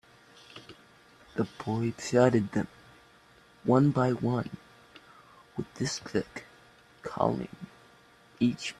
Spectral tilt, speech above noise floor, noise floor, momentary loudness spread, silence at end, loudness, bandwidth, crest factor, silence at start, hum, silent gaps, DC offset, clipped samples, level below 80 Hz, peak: -6.5 dB/octave; 31 dB; -59 dBFS; 24 LU; 0.1 s; -29 LUFS; 12.5 kHz; 22 dB; 0.55 s; none; none; under 0.1%; under 0.1%; -64 dBFS; -8 dBFS